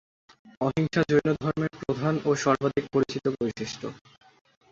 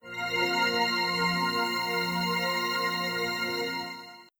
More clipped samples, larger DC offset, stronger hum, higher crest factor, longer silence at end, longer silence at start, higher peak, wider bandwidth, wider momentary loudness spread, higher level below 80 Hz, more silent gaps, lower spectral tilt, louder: neither; neither; neither; first, 20 dB vs 14 dB; first, 0.75 s vs 0.15 s; first, 0.45 s vs 0.05 s; first, -8 dBFS vs -14 dBFS; second, 7.8 kHz vs over 20 kHz; first, 9 LU vs 6 LU; first, -58 dBFS vs -64 dBFS; first, 0.57-0.61 s vs none; first, -6 dB/octave vs -3.5 dB/octave; about the same, -27 LUFS vs -27 LUFS